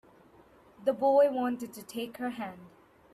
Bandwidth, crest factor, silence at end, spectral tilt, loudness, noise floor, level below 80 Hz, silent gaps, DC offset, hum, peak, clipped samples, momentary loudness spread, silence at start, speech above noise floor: 13.5 kHz; 18 dB; 0.45 s; -5 dB/octave; -30 LUFS; -59 dBFS; -74 dBFS; none; under 0.1%; none; -14 dBFS; under 0.1%; 16 LU; 0.8 s; 30 dB